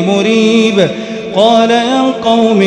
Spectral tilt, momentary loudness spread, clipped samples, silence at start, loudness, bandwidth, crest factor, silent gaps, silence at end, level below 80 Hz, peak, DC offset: -5 dB/octave; 6 LU; 0.5%; 0 s; -10 LUFS; 10 kHz; 10 dB; none; 0 s; -52 dBFS; 0 dBFS; under 0.1%